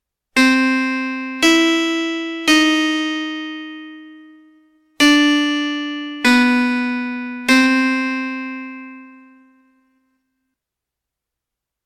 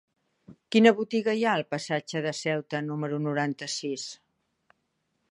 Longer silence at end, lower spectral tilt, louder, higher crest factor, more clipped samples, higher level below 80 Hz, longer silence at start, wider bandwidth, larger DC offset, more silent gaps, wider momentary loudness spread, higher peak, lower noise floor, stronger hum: first, 2.75 s vs 1.15 s; second, -1.5 dB/octave vs -5 dB/octave; first, -16 LUFS vs -27 LUFS; second, 18 dB vs 24 dB; neither; first, -58 dBFS vs -78 dBFS; second, 0.35 s vs 0.5 s; first, 16 kHz vs 11 kHz; neither; neither; first, 16 LU vs 11 LU; first, 0 dBFS vs -6 dBFS; first, -84 dBFS vs -77 dBFS; neither